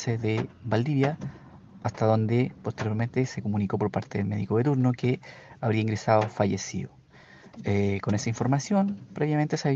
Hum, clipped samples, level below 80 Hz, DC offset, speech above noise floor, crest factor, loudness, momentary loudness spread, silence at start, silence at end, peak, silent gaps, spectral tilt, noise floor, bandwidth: none; under 0.1%; -62 dBFS; under 0.1%; 26 dB; 20 dB; -27 LUFS; 10 LU; 0 s; 0 s; -6 dBFS; none; -7 dB/octave; -52 dBFS; 7.8 kHz